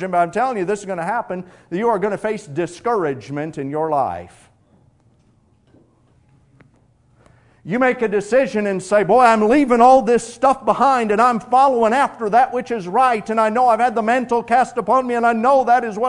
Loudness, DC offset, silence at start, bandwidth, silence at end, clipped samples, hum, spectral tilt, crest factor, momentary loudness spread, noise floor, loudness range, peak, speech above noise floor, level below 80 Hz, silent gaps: -17 LUFS; under 0.1%; 0 s; 11 kHz; 0 s; under 0.1%; none; -5.5 dB/octave; 18 dB; 11 LU; -57 dBFS; 12 LU; 0 dBFS; 40 dB; -56 dBFS; none